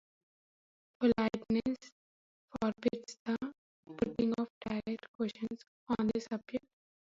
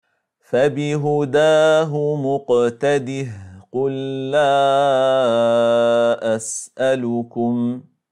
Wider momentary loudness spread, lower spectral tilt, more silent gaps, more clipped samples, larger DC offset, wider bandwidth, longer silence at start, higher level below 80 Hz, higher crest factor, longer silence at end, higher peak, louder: about the same, 10 LU vs 10 LU; about the same, -6.5 dB/octave vs -5.5 dB/octave; first, 1.92-2.48 s, 3.19-3.26 s, 3.58-3.83 s, 4.50-4.61 s, 5.08-5.19 s, 5.68-5.86 s vs none; neither; neither; second, 7.6 kHz vs 11.5 kHz; first, 1 s vs 0.5 s; about the same, -64 dBFS vs -68 dBFS; first, 20 dB vs 12 dB; first, 0.45 s vs 0.3 s; second, -16 dBFS vs -6 dBFS; second, -36 LUFS vs -18 LUFS